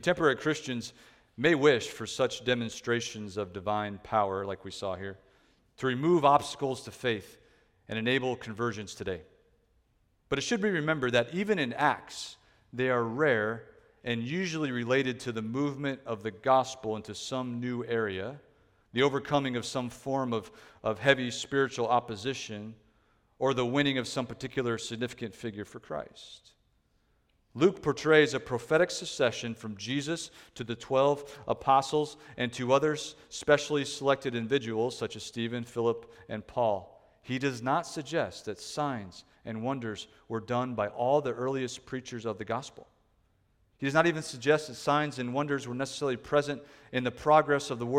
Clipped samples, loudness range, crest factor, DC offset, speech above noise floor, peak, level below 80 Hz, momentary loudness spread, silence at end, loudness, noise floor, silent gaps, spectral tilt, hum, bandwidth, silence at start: under 0.1%; 5 LU; 24 dB; under 0.1%; 40 dB; -8 dBFS; -64 dBFS; 13 LU; 0 s; -30 LUFS; -71 dBFS; none; -5 dB/octave; none; 14.5 kHz; 0 s